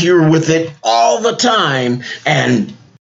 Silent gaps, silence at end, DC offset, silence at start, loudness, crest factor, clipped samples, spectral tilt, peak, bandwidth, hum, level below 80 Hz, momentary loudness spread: none; 0.35 s; under 0.1%; 0 s; -13 LUFS; 12 dB; under 0.1%; -4.5 dB/octave; 0 dBFS; 8 kHz; none; -60 dBFS; 7 LU